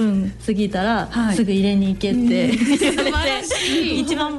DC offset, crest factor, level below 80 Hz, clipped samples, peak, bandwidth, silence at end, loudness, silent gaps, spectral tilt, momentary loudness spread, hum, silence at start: under 0.1%; 12 dB; -36 dBFS; under 0.1%; -8 dBFS; 12 kHz; 0 s; -19 LUFS; none; -4.5 dB/octave; 3 LU; none; 0 s